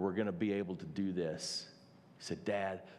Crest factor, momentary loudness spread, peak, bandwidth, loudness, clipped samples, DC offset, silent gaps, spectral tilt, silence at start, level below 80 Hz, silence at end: 16 dB; 8 LU; -22 dBFS; 13 kHz; -38 LUFS; under 0.1%; under 0.1%; none; -5 dB/octave; 0 s; -78 dBFS; 0 s